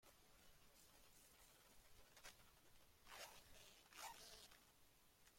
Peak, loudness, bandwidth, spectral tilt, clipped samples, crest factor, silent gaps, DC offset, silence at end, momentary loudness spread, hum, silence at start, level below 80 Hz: -42 dBFS; -63 LUFS; 16.5 kHz; -1 dB/octave; under 0.1%; 24 dB; none; under 0.1%; 0 s; 11 LU; none; 0 s; -78 dBFS